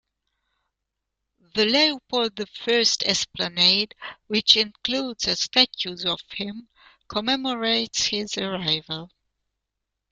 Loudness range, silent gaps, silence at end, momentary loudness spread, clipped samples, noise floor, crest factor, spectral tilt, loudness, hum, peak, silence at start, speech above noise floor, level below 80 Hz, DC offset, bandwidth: 5 LU; none; 1.05 s; 13 LU; under 0.1%; -83 dBFS; 24 dB; -2 dB/octave; -22 LUFS; none; -2 dBFS; 1.55 s; 59 dB; -60 dBFS; under 0.1%; 13 kHz